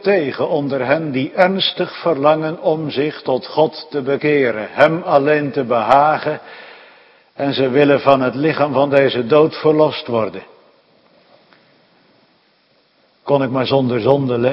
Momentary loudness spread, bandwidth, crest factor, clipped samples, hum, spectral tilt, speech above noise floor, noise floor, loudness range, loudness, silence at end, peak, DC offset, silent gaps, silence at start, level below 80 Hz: 8 LU; 6 kHz; 16 dB; under 0.1%; none; -8 dB/octave; 42 dB; -57 dBFS; 8 LU; -16 LUFS; 0 s; 0 dBFS; under 0.1%; none; 0 s; -60 dBFS